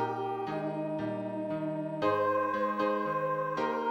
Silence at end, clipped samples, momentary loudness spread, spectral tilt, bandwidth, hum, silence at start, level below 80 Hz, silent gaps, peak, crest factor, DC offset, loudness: 0 s; under 0.1%; 6 LU; -7.5 dB/octave; 14.5 kHz; none; 0 s; -74 dBFS; none; -16 dBFS; 16 dB; under 0.1%; -32 LUFS